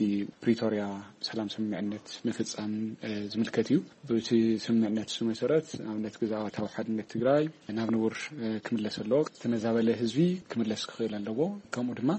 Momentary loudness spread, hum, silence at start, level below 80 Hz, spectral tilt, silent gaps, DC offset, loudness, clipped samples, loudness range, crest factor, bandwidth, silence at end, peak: 8 LU; none; 0 s; -70 dBFS; -6 dB/octave; none; under 0.1%; -31 LUFS; under 0.1%; 3 LU; 16 dB; 8.4 kHz; 0 s; -14 dBFS